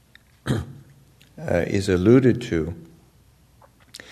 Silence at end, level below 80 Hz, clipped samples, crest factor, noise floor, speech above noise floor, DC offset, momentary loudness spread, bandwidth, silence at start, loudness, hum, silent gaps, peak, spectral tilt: 0.15 s; -48 dBFS; under 0.1%; 20 dB; -56 dBFS; 36 dB; under 0.1%; 25 LU; 13.5 kHz; 0.45 s; -21 LUFS; none; none; -4 dBFS; -7 dB/octave